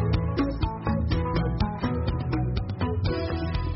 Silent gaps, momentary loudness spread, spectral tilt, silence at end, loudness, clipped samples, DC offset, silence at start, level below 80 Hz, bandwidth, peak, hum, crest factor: none; 3 LU; -7 dB/octave; 0 s; -28 LUFS; under 0.1%; under 0.1%; 0 s; -32 dBFS; 5.8 kHz; -12 dBFS; none; 14 dB